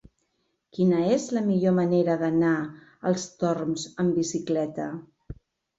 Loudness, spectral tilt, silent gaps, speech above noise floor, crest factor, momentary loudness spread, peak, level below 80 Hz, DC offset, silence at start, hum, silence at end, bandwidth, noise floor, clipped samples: -25 LUFS; -6.5 dB/octave; none; 50 dB; 16 dB; 12 LU; -10 dBFS; -58 dBFS; under 0.1%; 0.75 s; none; 0.45 s; 8 kHz; -75 dBFS; under 0.1%